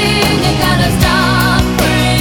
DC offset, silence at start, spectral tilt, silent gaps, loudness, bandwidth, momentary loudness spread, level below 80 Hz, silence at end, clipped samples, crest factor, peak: under 0.1%; 0 s; -4.5 dB/octave; none; -11 LUFS; over 20 kHz; 1 LU; -22 dBFS; 0 s; under 0.1%; 10 dB; 0 dBFS